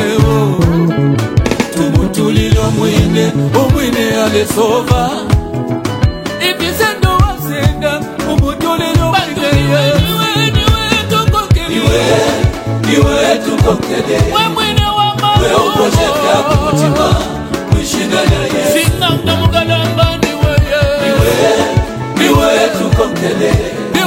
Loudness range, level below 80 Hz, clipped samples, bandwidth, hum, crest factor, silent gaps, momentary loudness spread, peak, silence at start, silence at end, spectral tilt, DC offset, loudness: 2 LU; -22 dBFS; 0.3%; 17 kHz; none; 12 dB; none; 4 LU; 0 dBFS; 0 s; 0 s; -5.5 dB/octave; under 0.1%; -12 LUFS